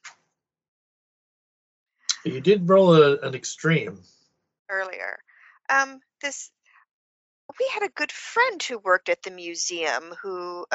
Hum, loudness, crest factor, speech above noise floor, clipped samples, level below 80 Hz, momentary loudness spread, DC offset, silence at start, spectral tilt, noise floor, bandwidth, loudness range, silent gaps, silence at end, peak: none; -23 LUFS; 22 dB; 54 dB; under 0.1%; -72 dBFS; 17 LU; under 0.1%; 0.05 s; -3.5 dB/octave; -77 dBFS; 8 kHz; 8 LU; 0.68-1.86 s, 4.59-4.65 s, 6.91-7.49 s; 0 s; -4 dBFS